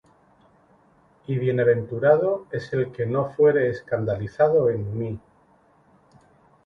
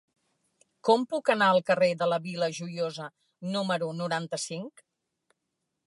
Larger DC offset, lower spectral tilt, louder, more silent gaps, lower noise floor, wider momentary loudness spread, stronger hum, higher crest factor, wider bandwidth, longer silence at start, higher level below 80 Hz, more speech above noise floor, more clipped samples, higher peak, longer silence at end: neither; first, -9.5 dB/octave vs -4.5 dB/octave; first, -23 LUFS vs -28 LUFS; neither; second, -59 dBFS vs -82 dBFS; second, 11 LU vs 16 LU; neither; about the same, 20 dB vs 20 dB; second, 6.4 kHz vs 11.5 kHz; first, 1.3 s vs 0.85 s; first, -56 dBFS vs -82 dBFS; second, 37 dB vs 55 dB; neither; first, -4 dBFS vs -8 dBFS; first, 1.45 s vs 1.15 s